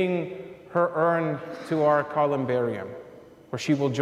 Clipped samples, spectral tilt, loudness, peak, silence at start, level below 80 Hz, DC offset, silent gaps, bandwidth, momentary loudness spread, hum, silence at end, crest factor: under 0.1%; -7 dB/octave; -26 LUFS; -10 dBFS; 0 s; -68 dBFS; under 0.1%; none; 13 kHz; 14 LU; none; 0 s; 16 dB